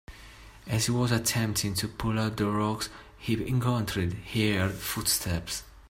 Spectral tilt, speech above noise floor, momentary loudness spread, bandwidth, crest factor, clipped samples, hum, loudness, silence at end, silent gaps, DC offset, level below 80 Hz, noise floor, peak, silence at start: -4.5 dB/octave; 21 dB; 10 LU; 16 kHz; 18 dB; under 0.1%; none; -28 LUFS; 0.05 s; none; under 0.1%; -50 dBFS; -49 dBFS; -12 dBFS; 0.1 s